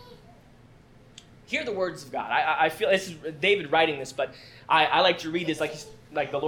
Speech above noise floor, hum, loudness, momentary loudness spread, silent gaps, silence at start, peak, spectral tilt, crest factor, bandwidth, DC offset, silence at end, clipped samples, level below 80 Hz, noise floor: 27 dB; none; -25 LUFS; 12 LU; none; 0 s; -6 dBFS; -4 dB/octave; 20 dB; 18 kHz; under 0.1%; 0 s; under 0.1%; -62 dBFS; -53 dBFS